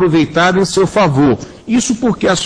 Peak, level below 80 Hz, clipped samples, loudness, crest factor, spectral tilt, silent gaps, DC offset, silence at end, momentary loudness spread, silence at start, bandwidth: 0 dBFS; -40 dBFS; under 0.1%; -13 LUFS; 12 dB; -5 dB/octave; none; under 0.1%; 0 s; 4 LU; 0 s; 10.5 kHz